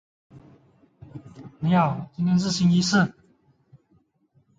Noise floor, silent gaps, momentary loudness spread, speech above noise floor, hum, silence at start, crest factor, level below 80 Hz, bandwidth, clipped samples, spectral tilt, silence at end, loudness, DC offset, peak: -65 dBFS; none; 24 LU; 44 dB; none; 0.35 s; 18 dB; -58 dBFS; 8.6 kHz; under 0.1%; -5.5 dB/octave; 1.5 s; -22 LUFS; under 0.1%; -8 dBFS